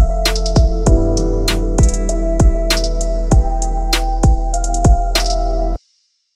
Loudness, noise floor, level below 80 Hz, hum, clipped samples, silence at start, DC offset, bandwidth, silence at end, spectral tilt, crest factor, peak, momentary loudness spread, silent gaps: -16 LUFS; -61 dBFS; -16 dBFS; none; under 0.1%; 0 s; under 0.1%; 15 kHz; 0.6 s; -5 dB/octave; 12 dB; 0 dBFS; 6 LU; none